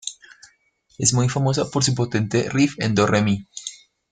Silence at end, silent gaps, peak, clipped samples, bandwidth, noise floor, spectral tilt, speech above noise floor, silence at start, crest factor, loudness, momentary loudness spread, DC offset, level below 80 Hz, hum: 0.35 s; none; -2 dBFS; under 0.1%; 9.6 kHz; -61 dBFS; -4.5 dB/octave; 41 dB; 0.05 s; 20 dB; -20 LUFS; 15 LU; under 0.1%; -54 dBFS; none